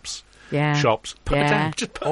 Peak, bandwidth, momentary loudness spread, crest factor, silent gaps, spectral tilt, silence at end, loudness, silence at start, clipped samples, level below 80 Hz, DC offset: -4 dBFS; 11.5 kHz; 10 LU; 18 dB; none; -5 dB/octave; 0 s; -22 LUFS; 0.05 s; under 0.1%; -38 dBFS; under 0.1%